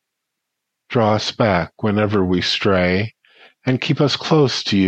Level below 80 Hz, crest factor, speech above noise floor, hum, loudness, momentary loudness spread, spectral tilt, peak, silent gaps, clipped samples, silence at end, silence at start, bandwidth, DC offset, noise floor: -50 dBFS; 16 dB; 62 dB; none; -18 LUFS; 6 LU; -6 dB/octave; -2 dBFS; none; under 0.1%; 0 s; 0.9 s; 8.6 kHz; under 0.1%; -79 dBFS